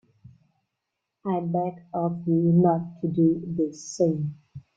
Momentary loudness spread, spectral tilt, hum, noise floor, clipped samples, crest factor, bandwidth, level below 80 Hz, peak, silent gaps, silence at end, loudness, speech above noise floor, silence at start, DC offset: 10 LU; -8.5 dB/octave; none; -82 dBFS; under 0.1%; 16 dB; 7.8 kHz; -64 dBFS; -10 dBFS; none; 0.2 s; -25 LUFS; 58 dB; 1.25 s; under 0.1%